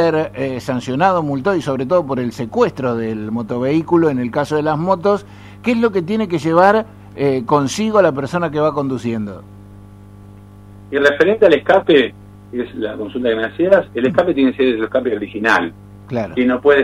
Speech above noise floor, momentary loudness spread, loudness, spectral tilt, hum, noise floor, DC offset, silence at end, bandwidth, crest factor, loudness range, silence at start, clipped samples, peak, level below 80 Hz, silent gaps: 23 dB; 11 LU; -16 LUFS; -6 dB/octave; 50 Hz at -40 dBFS; -39 dBFS; under 0.1%; 0 s; 13.5 kHz; 16 dB; 3 LU; 0 s; under 0.1%; 0 dBFS; -50 dBFS; none